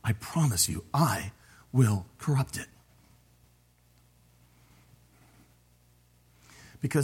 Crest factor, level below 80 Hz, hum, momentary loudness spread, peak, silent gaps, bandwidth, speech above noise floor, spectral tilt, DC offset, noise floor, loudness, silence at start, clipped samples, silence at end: 22 dB; -58 dBFS; 60 Hz at -60 dBFS; 12 LU; -10 dBFS; none; 16.5 kHz; 36 dB; -5 dB/octave; under 0.1%; -63 dBFS; -28 LUFS; 0.05 s; under 0.1%; 0 s